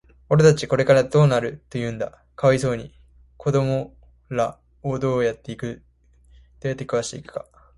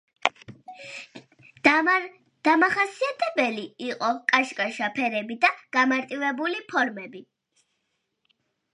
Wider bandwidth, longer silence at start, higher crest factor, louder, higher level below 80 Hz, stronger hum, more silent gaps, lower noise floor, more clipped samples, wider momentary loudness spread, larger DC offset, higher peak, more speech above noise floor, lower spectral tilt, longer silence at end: about the same, 11.5 kHz vs 11.5 kHz; about the same, 0.3 s vs 0.25 s; second, 18 dB vs 26 dB; about the same, -22 LUFS vs -24 LUFS; first, -50 dBFS vs -74 dBFS; neither; neither; second, -54 dBFS vs -77 dBFS; neither; second, 16 LU vs 19 LU; neither; second, -4 dBFS vs 0 dBFS; second, 34 dB vs 52 dB; first, -6.5 dB/octave vs -3.5 dB/octave; second, 0.35 s vs 1.5 s